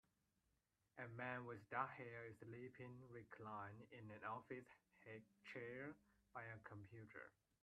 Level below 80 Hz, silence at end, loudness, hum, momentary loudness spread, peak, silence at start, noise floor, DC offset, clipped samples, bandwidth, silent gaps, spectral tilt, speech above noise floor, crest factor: -86 dBFS; 0.3 s; -55 LUFS; none; 11 LU; -32 dBFS; 0.95 s; -88 dBFS; under 0.1%; under 0.1%; 8.8 kHz; none; -7.5 dB/octave; 32 dB; 24 dB